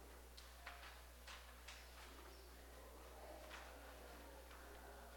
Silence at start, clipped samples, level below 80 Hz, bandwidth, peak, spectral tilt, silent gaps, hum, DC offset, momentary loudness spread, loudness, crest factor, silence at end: 0 s; under 0.1%; -62 dBFS; 17 kHz; -36 dBFS; -3 dB/octave; none; 60 Hz at -65 dBFS; under 0.1%; 4 LU; -58 LUFS; 22 dB; 0 s